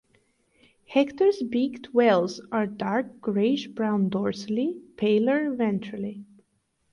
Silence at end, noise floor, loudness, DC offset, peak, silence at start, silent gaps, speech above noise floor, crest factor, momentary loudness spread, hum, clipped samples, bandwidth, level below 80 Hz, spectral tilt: 0.7 s; -72 dBFS; -25 LUFS; under 0.1%; -8 dBFS; 0.9 s; none; 47 dB; 18 dB; 8 LU; none; under 0.1%; 10.5 kHz; -68 dBFS; -7 dB/octave